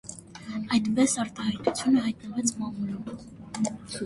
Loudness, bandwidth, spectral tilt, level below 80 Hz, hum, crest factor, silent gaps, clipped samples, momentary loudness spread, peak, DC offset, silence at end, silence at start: -28 LUFS; 11.5 kHz; -4 dB/octave; -60 dBFS; none; 20 dB; none; under 0.1%; 16 LU; -8 dBFS; under 0.1%; 0 s; 0.05 s